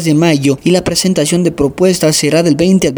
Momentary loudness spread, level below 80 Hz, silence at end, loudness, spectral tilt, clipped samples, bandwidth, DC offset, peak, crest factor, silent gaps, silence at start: 2 LU; -40 dBFS; 0 s; -11 LUFS; -5 dB/octave; under 0.1%; over 20 kHz; under 0.1%; 0 dBFS; 10 dB; none; 0 s